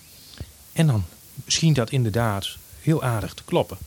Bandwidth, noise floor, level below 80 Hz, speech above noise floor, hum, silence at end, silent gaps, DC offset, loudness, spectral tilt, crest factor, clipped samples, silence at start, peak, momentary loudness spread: 18 kHz; -41 dBFS; -48 dBFS; 19 dB; none; 0 s; none; under 0.1%; -23 LUFS; -5 dB/octave; 18 dB; under 0.1%; 0.25 s; -6 dBFS; 20 LU